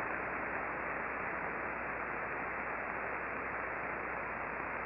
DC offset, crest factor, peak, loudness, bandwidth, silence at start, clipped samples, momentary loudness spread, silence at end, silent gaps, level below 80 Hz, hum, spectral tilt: under 0.1%; 16 dB; -24 dBFS; -38 LUFS; 5.6 kHz; 0 s; under 0.1%; 1 LU; 0 s; none; -60 dBFS; none; -5 dB/octave